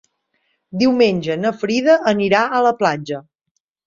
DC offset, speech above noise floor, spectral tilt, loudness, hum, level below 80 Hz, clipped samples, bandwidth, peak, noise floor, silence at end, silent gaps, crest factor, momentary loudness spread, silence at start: under 0.1%; 57 dB; -5.5 dB/octave; -16 LUFS; none; -60 dBFS; under 0.1%; 7.4 kHz; -2 dBFS; -73 dBFS; 0.65 s; none; 16 dB; 12 LU; 0.75 s